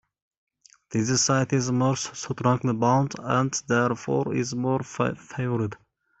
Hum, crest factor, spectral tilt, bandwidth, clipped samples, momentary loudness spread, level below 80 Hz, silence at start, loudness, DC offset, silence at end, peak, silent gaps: none; 18 dB; -5 dB/octave; 8.4 kHz; under 0.1%; 7 LU; -60 dBFS; 0.9 s; -25 LUFS; under 0.1%; 0.45 s; -8 dBFS; none